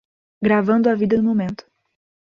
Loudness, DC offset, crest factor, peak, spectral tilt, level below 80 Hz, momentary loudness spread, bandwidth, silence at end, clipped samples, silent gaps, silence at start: -19 LUFS; under 0.1%; 16 dB; -4 dBFS; -9 dB/octave; -56 dBFS; 10 LU; 6.2 kHz; 0.8 s; under 0.1%; none; 0.4 s